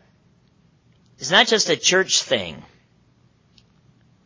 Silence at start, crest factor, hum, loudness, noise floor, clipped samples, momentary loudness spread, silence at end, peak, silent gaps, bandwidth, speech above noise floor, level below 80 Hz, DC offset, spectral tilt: 1.2 s; 22 dB; none; -17 LUFS; -58 dBFS; under 0.1%; 13 LU; 1.65 s; -2 dBFS; none; 7.8 kHz; 39 dB; -62 dBFS; under 0.1%; -1.5 dB/octave